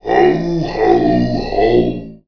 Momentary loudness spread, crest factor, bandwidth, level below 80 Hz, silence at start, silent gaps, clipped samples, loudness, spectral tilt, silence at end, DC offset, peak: 5 LU; 14 dB; 5.4 kHz; -32 dBFS; 0.05 s; none; under 0.1%; -14 LUFS; -8 dB/octave; 0.1 s; 1%; 0 dBFS